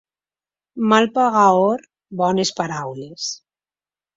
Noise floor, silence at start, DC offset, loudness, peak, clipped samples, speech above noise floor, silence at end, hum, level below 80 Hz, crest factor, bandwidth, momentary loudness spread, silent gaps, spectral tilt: under -90 dBFS; 0.75 s; under 0.1%; -18 LUFS; 0 dBFS; under 0.1%; over 72 dB; 0.8 s; 50 Hz at -45 dBFS; -64 dBFS; 20 dB; 7.8 kHz; 17 LU; none; -4.5 dB/octave